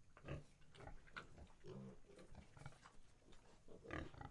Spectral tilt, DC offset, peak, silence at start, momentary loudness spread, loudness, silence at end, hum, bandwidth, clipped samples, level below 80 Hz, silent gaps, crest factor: -6 dB/octave; under 0.1%; -32 dBFS; 0 s; 14 LU; -59 LUFS; 0 s; none; 11 kHz; under 0.1%; -66 dBFS; none; 24 dB